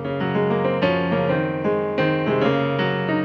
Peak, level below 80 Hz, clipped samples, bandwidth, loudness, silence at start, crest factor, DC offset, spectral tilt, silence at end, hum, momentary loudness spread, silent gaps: -6 dBFS; -50 dBFS; under 0.1%; 6.4 kHz; -21 LUFS; 0 s; 14 dB; under 0.1%; -8.5 dB/octave; 0 s; none; 2 LU; none